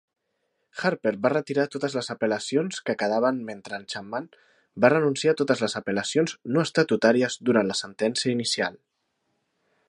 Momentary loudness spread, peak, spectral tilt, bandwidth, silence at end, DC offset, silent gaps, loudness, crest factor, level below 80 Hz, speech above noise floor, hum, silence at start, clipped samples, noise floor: 12 LU; -2 dBFS; -4.5 dB/octave; 11.5 kHz; 1.15 s; under 0.1%; none; -25 LUFS; 22 dB; -70 dBFS; 51 dB; none; 0.75 s; under 0.1%; -76 dBFS